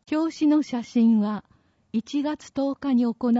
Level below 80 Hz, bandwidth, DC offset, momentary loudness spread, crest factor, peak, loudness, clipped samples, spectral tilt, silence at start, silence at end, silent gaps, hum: -66 dBFS; 7.8 kHz; under 0.1%; 9 LU; 12 dB; -12 dBFS; -24 LUFS; under 0.1%; -6.5 dB/octave; 0.1 s; 0 s; none; none